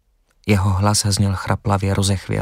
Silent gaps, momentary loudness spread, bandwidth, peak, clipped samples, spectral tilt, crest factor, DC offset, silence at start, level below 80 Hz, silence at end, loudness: none; 4 LU; 16 kHz; -2 dBFS; under 0.1%; -5 dB/octave; 16 dB; under 0.1%; 0.45 s; -42 dBFS; 0 s; -18 LUFS